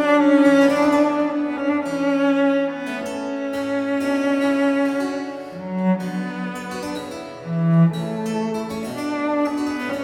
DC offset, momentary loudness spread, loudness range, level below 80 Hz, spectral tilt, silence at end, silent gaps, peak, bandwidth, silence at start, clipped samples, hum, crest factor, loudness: under 0.1%; 13 LU; 4 LU; -60 dBFS; -7 dB/octave; 0 s; none; -4 dBFS; 13.5 kHz; 0 s; under 0.1%; none; 16 dB; -21 LUFS